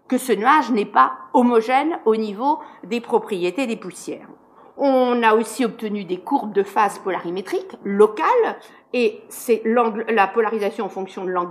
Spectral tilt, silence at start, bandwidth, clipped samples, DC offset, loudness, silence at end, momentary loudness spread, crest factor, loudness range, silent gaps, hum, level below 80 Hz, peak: -5 dB/octave; 0.1 s; 15.5 kHz; under 0.1%; under 0.1%; -20 LUFS; 0 s; 11 LU; 18 dB; 3 LU; none; none; -76 dBFS; -2 dBFS